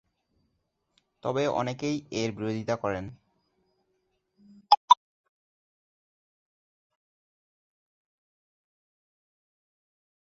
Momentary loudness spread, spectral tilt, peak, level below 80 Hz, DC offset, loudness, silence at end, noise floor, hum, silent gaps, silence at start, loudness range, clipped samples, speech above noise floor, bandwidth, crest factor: 13 LU; -5 dB/octave; -4 dBFS; -66 dBFS; under 0.1%; -27 LUFS; 5.4 s; -77 dBFS; none; 4.77-4.88 s; 1.25 s; 4 LU; under 0.1%; 47 dB; 7.8 kHz; 30 dB